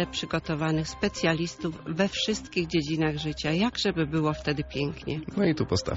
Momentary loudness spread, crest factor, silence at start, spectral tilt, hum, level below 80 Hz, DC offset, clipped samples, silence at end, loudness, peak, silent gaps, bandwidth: 5 LU; 18 dB; 0 s; -4.5 dB/octave; none; -48 dBFS; under 0.1%; under 0.1%; 0 s; -28 LUFS; -10 dBFS; none; 8 kHz